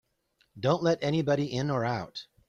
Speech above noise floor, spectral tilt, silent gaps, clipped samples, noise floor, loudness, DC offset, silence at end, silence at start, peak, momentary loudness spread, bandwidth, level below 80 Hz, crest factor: 44 dB; -6.5 dB/octave; none; under 0.1%; -72 dBFS; -29 LUFS; under 0.1%; 0.25 s; 0.55 s; -12 dBFS; 7 LU; 7.6 kHz; -62 dBFS; 18 dB